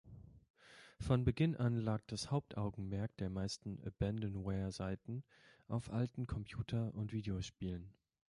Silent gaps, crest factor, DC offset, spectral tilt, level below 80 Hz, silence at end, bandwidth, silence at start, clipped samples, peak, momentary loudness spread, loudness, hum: 0.50-0.54 s; 18 dB; under 0.1%; -7 dB/octave; -56 dBFS; 0.4 s; 11.5 kHz; 0.05 s; under 0.1%; -22 dBFS; 13 LU; -41 LUFS; none